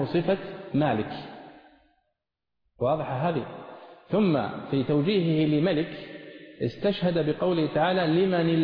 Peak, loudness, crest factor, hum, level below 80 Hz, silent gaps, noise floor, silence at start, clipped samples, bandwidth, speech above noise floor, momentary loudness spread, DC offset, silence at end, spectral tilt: -12 dBFS; -26 LUFS; 14 dB; none; -60 dBFS; none; -83 dBFS; 0 s; under 0.1%; 5.4 kHz; 58 dB; 17 LU; under 0.1%; 0 s; -10 dB/octave